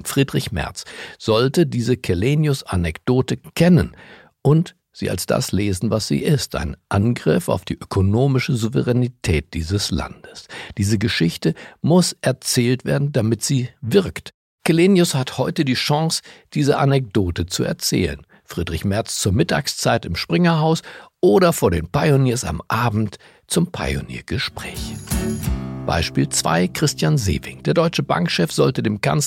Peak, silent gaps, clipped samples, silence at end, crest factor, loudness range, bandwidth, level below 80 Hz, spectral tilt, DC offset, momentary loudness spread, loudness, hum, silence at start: -4 dBFS; 14.34-14.58 s; under 0.1%; 0 s; 16 dB; 3 LU; 16.5 kHz; -38 dBFS; -5.5 dB/octave; under 0.1%; 10 LU; -20 LUFS; none; 0 s